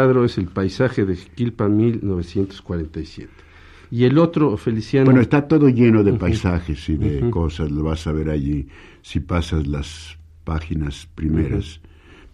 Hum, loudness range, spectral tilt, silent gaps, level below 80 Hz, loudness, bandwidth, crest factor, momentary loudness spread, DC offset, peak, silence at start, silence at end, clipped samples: none; 8 LU; -8 dB/octave; none; -34 dBFS; -20 LUFS; 11 kHz; 18 dB; 15 LU; under 0.1%; -2 dBFS; 0 s; 0.55 s; under 0.1%